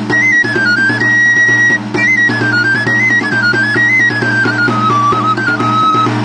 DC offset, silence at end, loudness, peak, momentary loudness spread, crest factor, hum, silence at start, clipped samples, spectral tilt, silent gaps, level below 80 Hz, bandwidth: under 0.1%; 0 s; -9 LUFS; -2 dBFS; 4 LU; 8 dB; none; 0 s; under 0.1%; -4.5 dB/octave; none; -50 dBFS; 10 kHz